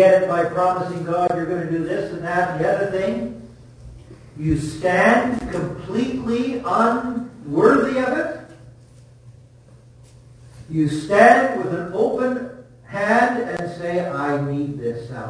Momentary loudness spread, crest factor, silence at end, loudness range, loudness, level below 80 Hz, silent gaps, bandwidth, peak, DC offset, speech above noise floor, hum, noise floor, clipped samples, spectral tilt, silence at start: 13 LU; 20 dB; 0 s; 5 LU; -20 LUFS; -48 dBFS; none; 10.5 kHz; 0 dBFS; under 0.1%; 28 dB; none; -47 dBFS; under 0.1%; -6.5 dB/octave; 0 s